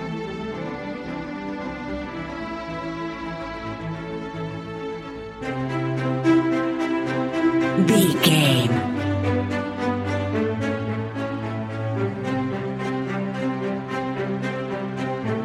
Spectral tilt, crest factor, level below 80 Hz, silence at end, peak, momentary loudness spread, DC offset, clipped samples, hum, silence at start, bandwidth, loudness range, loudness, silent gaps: -5.5 dB/octave; 20 dB; -50 dBFS; 0 s; -4 dBFS; 13 LU; under 0.1%; under 0.1%; none; 0 s; 16 kHz; 11 LU; -24 LUFS; none